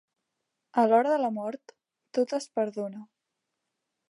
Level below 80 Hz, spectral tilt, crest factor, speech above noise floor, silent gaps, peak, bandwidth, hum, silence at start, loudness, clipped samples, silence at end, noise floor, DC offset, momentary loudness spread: -88 dBFS; -5.5 dB/octave; 20 dB; 57 dB; none; -10 dBFS; 11.5 kHz; none; 0.75 s; -28 LUFS; under 0.1%; 1.05 s; -84 dBFS; under 0.1%; 15 LU